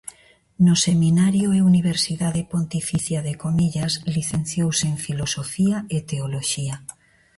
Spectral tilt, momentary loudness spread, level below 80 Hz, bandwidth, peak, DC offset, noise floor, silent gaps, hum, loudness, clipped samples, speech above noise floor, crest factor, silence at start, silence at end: -5 dB/octave; 9 LU; -50 dBFS; 11.5 kHz; -4 dBFS; under 0.1%; -43 dBFS; none; none; -21 LUFS; under 0.1%; 23 dB; 18 dB; 0.05 s; 0.45 s